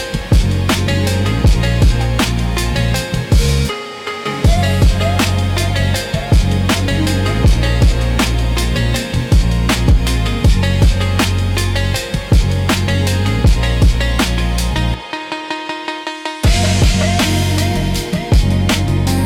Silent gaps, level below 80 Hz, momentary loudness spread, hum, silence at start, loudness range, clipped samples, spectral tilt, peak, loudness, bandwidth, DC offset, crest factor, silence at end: none; -18 dBFS; 6 LU; none; 0 s; 2 LU; under 0.1%; -5 dB/octave; -2 dBFS; -15 LUFS; 17 kHz; under 0.1%; 10 dB; 0 s